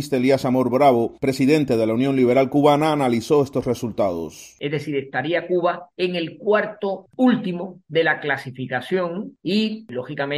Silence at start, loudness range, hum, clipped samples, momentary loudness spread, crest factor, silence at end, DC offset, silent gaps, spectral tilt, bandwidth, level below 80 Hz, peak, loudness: 0 s; 5 LU; none; under 0.1%; 11 LU; 18 dB; 0 s; under 0.1%; none; -6.5 dB/octave; 15.5 kHz; -58 dBFS; -2 dBFS; -21 LUFS